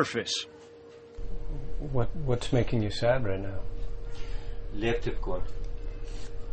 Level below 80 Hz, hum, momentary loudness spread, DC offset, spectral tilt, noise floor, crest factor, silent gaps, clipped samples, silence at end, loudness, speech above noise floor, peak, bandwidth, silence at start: -36 dBFS; none; 16 LU; under 0.1%; -5.5 dB/octave; -49 dBFS; 18 dB; none; under 0.1%; 0 s; -33 LUFS; 23 dB; -12 dBFS; 8.4 kHz; 0 s